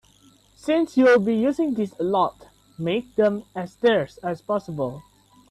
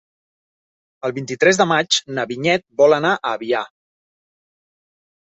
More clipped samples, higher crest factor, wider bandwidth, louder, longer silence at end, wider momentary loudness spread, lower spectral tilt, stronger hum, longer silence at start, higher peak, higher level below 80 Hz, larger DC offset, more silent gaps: neither; about the same, 16 dB vs 18 dB; first, 12.5 kHz vs 8.2 kHz; second, -23 LUFS vs -18 LUFS; second, 0.5 s vs 1.65 s; about the same, 14 LU vs 12 LU; first, -6.5 dB/octave vs -3.5 dB/octave; neither; second, 0.65 s vs 1.05 s; second, -8 dBFS vs -2 dBFS; about the same, -60 dBFS vs -64 dBFS; neither; neither